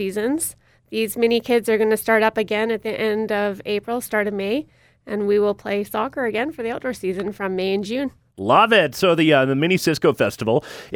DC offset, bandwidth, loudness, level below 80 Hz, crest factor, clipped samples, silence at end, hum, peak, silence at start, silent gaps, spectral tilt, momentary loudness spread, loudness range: under 0.1%; 19 kHz; -20 LUFS; -58 dBFS; 18 dB; under 0.1%; 0 s; none; -2 dBFS; 0 s; none; -4.5 dB/octave; 10 LU; 5 LU